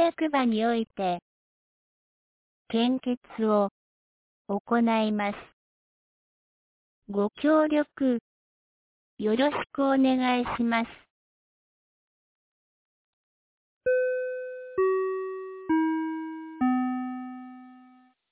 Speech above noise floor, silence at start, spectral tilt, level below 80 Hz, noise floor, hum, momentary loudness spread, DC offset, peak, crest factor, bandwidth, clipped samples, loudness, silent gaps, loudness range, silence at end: 32 dB; 0 s; -4 dB/octave; -66 dBFS; -57 dBFS; none; 12 LU; under 0.1%; -12 dBFS; 16 dB; 4 kHz; under 0.1%; -27 LUFS; 1.22-2.65 s, 3.17-3.21 s, 3.71-4.45 s, 4.60-4.65 s, 5.53-7.02 s, 8.21-9.17 s, 11.10-13.81 s; 6 LU; 0.55 s